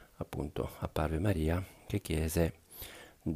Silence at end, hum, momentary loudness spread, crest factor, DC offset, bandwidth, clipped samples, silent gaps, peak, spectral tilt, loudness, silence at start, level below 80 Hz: 0 s; none; 15 LU; 18 dB; under 0.1%; 15.5 kHz; under 0.1%; none; -16 dBFS; -6.5 dB/octave; -35 LUFS; 0 s; -44 dBFS